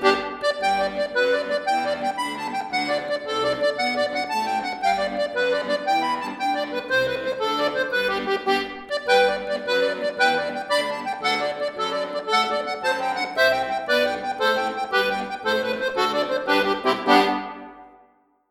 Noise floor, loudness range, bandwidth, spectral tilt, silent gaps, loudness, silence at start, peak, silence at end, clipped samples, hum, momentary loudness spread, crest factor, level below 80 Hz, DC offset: -59 dBFS; 2 LU; 17 kHz; -3 dB/octave; none; -23 LUFS; 0 s; -2 dBFS; 0.6 s; under 0.1%; none; 6 LU; 20 dB; -60 dBFS; under 0.1%